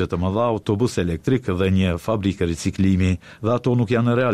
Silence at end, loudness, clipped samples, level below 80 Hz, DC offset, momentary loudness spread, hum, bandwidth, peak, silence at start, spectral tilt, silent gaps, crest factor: 0 s; -21 LUFS; under 0.1%; -42 dBFS; 0.1%; 4 LU; none; 12.5 kHz; -8 dBFS; 0 s; -7 dB/octave; none; 12 dB